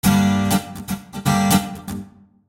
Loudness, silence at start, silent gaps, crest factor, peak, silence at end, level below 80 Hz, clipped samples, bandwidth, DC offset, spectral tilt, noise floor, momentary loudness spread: -20 LUFS; 0.05 s; none; 18 dB; -2 dBFS; 0.4 s; -42 dBFS; under 0.1%; 16.5 kHz; under 0.1%; -5 dB/octave; -39 dBFS; 15 LU